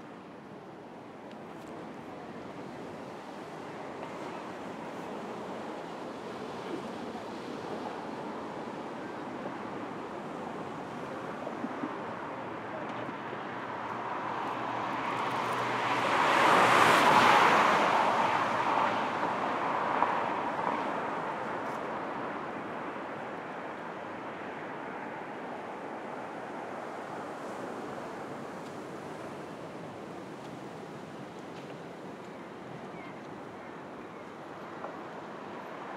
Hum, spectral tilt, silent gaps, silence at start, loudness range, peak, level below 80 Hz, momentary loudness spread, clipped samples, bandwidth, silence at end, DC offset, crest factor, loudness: none; -4 dB/octave; none; 0 s; 19 LU; -10 dBFS; -74 dBFS; 18 LU; under 0.1%; 16 kHz; 0 s; under 0.1%; 24 dB; -32 LUFS